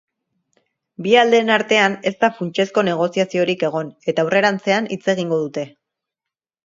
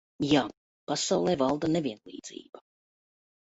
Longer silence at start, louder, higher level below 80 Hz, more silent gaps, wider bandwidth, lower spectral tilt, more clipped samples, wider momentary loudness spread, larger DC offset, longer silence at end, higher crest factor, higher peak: first, 1 s vs 0.2 s; first, -18 LUFS vs -28 LUFS; second, -68 dBFS vs -62 dBFS; second, none vs 0.57-0.87 s, 2.49-2.53 s; about the same, 7.8 kHz vs 8.2 kHz; about the same, -5 dB/octave vs -4.5 dB/octave; neither; second, 9 LU vs 18 LU; neither; about the same, 0.95 s vs 0.85 s; about the same, 20 dB vs 20 dB; first, 0 dBFS vs -10 dBFS